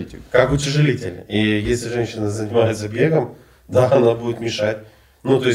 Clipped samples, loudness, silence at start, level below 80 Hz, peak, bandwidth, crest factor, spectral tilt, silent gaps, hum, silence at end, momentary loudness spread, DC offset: under 0.1%; -19 LUFS; 0 s; -42 dBFS; -2 dBFS; 15 kHz; 18 dB; -6 dB/octave; none; none; 0 s; 8 LU; under 0.1%